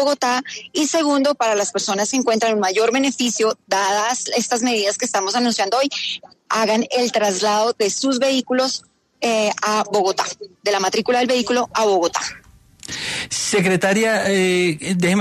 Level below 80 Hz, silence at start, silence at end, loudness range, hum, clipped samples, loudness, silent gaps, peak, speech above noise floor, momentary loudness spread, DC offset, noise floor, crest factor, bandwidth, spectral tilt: -62 dBFS; 0 s; 0 s; 1 LU; none; under 0.1%; -19 LUFS; none; -6 dBFS; 21 dB; 7 LU; under 0.1%; -39 dBFS; 12 dB; 14 kHz; -3 dB/octave